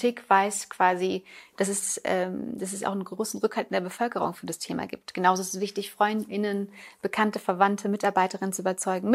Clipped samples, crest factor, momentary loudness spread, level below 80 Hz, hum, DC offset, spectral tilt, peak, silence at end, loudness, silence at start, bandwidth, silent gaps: under 0.1%; 20 dB; 9 LU; -74 dBFS; none; under 0.1%; -4 dB/octave; -6 dBFS; 0 s; -27 LUFS; 0 s; 16 kHz; none